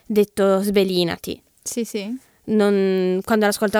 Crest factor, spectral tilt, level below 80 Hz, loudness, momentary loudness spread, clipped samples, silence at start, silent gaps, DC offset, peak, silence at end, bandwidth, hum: 16 dB; -5 dB/octave; -56 dBFS; -20 LUFS; 13 LU; under 0.1%; 0.1 s; none; under 0.1%; -4 dBFS; 0 s; 19.5 kHz; none